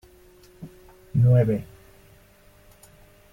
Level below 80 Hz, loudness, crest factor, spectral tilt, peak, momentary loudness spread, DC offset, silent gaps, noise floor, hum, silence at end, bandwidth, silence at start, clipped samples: -50 dBFS; -22 LUFS; 18 dB; -10 dB/octave; -8 dBFS; 27 LU; under 0.1%; none; -54 dBFS; none; 1.7 s; 9.8 kHz; 0.6 s; under 0.1%